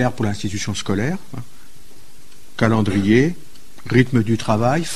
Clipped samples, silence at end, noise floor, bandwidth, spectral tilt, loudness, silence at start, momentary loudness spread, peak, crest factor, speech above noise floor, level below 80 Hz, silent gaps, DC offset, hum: under 0.1%; 0 s; -48 dBFS; 13.5 kHz; -6 dB/octave; -19 LUFS; 0 s; 20 LU; 0 dBFS; 20 dB; 30 dB; -44 dBFS; none; 4%; none